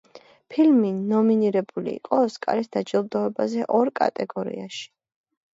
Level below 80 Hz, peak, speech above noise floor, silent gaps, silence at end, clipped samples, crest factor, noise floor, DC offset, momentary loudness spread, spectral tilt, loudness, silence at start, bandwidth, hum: -74 dBFS; -6 dBFS; 25 dB; none; 0.7 s; under 0.1%; 16 dB; -47 dBFS; under 0.1%; 12 LU; -7 dB/octave; -23 LUFS; 0.15 s; 7.8 kHz; none